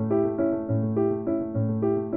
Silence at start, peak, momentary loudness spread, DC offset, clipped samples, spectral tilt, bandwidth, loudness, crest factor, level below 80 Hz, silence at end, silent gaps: 0 s; -12 dBFS; 3 LU; 0.1%; under 0.1%; -13 dB/octave; 2.7 kHz; -26 LUFS; 12 dB; -58 dBFS; 0 s; none